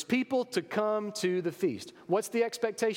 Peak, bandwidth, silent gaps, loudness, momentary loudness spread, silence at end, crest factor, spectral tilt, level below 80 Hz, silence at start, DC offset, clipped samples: -14 dBFS; 17 kHz; none; -31 LUFS; 4 LU; 0 s; 16 dB; -4.5 dB/octave; -82 dBFS; 0 s; under 0.1%; under 0.1%